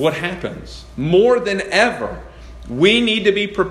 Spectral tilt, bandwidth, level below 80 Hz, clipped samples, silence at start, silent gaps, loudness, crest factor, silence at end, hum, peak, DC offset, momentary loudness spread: -5 dB/octave; 13 kHz; -40 dBFS; under 0.1%; 0 s; none; -16 LUFS; 18 dB; 0 s; none; 0 dBFS; under 0.1%; 16 LU